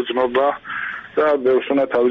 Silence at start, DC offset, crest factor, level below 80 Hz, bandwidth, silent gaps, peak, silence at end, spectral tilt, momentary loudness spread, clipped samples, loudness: 0 s; under 0.1%; 12 dB; -58 dBFS; 5.2 kHz; none; -6 dBFS; 0 s; -2 dB/octave; 9 LU; under 0.1%; -19 LUFS